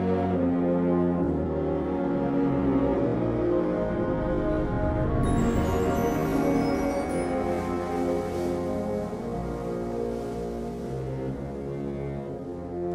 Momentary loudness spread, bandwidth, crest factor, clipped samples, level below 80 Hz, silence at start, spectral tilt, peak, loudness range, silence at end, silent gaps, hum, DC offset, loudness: 9 LU; 15 kHz; 14 dB; under 0.1%; -38 dBFS; 0 s; -8 dB/octave; -12 dBFS; 7 LU; 0 s; none; none; under 0.1%; -27 LUFS